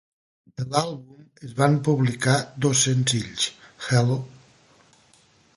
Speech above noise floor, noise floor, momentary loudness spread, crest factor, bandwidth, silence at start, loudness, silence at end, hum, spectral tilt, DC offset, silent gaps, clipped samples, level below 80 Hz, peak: 36 dB; -58 dBFS; 17 LU; 20 dB; 11.5 kHz; 0.6 s; -23 LUFS; 1.3 s; none; -4.5 dB/octave; under 0.1%; none; under 0.1%; -60 dBFS; -4 dBFS